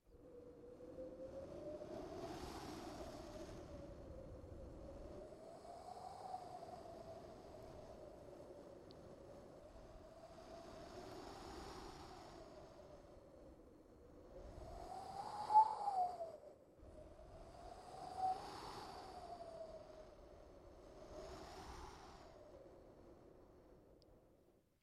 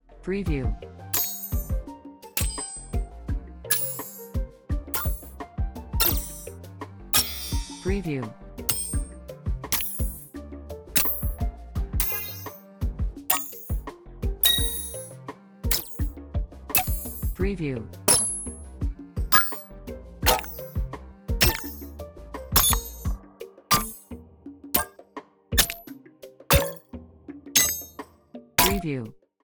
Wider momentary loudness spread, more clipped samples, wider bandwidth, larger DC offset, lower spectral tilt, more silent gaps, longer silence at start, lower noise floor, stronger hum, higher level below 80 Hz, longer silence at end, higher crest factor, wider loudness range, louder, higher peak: second, 18 LU vs 21 LU; neither; second, 14 kHz vs over 20 kHz; neither; first, -5.5 dB/octave vs -3 dB/octave; neither; about the same, 0.05 s vs 0.1 s; first, -74 dBFS vs -48 dBFS; neither; second, -66 dBFS vs -34 dBFS; about the same, 0.25 s vs 0.3 s; about the same, 28 dB vs 26 dB; first, 16 LU vs 5 LU; second, -49 LUFS vs -25 LUFS; second, -22 dBFS vs -2 dBFS